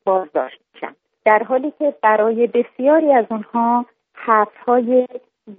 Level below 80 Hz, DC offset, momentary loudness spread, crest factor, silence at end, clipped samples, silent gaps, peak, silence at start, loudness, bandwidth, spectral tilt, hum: -72 dBFS; under 0.1%; 17 LU; 16 dB; 0.05 s; under 0.1%; none; 0 dBFS; 0.05 s; -17 LUFS; 3.8 kHz; -4 dB/octave; none